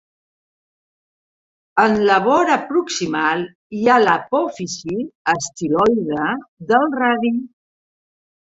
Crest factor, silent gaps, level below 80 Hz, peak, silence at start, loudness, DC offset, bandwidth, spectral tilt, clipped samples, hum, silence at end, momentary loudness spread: 18 dB; 3.55-3.70 s, 5.15-5.25 s, 6.48-6.57 s; -58 dBFS; -2 dBFS; 1.75 s; -18 LUFS; under 0.1%; 8 kHz; -4.5 dB/octave; under 0.1%; none; 0.95 s; 11 LU